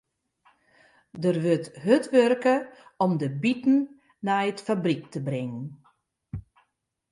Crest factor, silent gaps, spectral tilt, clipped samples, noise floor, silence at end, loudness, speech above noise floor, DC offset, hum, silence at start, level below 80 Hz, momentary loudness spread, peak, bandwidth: 20 dB; none; -7 dB/octave; under 0.1%; -75 dBFS; 0.7 s; -25 LUFS; 50 dB; under 0.1%; none; 1.15 s; -60 dBFS; 20 LU; -6 dBFS; 11.5 kHz